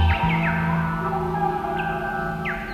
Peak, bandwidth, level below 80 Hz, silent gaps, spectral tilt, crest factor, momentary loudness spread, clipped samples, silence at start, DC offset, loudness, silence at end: -8 dBFS; 15 kHz; -34 dBFS; none; -7.5 dB/octave; 14 dB; 6 LU; under 0.1%; 0 s; under 0.1%; -24 LUFS; 0 s